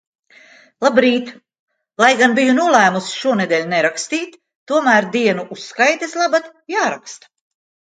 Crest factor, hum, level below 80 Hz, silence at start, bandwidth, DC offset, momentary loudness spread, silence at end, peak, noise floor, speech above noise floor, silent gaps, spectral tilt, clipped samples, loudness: 18 dB; none; -66 dBFS; 0.8 s; 9.4 kHz; under 0.1%; 11 LU; 0.7 s; 0 dBFS; -47 dBFS; 31 dB; 1.59-1.68 s, 4.55-4.66 s; -3.5 dB/octave; under 0.1%; -16 LUFS